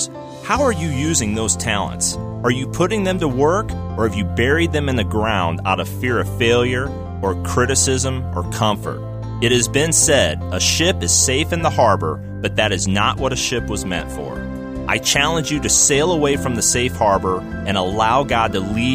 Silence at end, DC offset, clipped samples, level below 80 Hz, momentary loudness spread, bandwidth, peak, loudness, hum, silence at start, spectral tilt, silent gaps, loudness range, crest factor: 0 s; under 0.1%; under 0.1%; -34 dBFS; 10 LU; 15.5 kHz; -2 dBFS; -18 LUFS; none; 0 s; -3.5 dB/octave; none; 3 LU; 16 dB